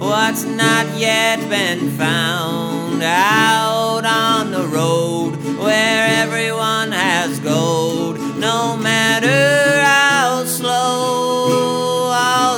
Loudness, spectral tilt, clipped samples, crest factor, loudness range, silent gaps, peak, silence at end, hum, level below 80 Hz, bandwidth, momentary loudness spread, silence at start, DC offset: -15 LUFS; -3.5 dB/octave; under 0.1%; 16 dB; 2 LU; none; 0 dBFS; 0 s; none; -62 dBFS; over 20 kHz; 7 LU; 0 s; under 0.1%